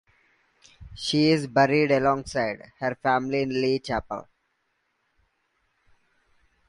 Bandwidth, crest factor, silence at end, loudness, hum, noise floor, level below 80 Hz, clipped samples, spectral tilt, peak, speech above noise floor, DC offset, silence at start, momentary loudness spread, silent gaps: 11.5 kHz; 20 dB; 2.45 s; -24 LUFS; none; -74 dBFS; -54 dBFS; under 0.1%; -5.5 dB/octave; -6 dBFS; 50 dB; under 0.1%; 0.8 s; 10 LU; none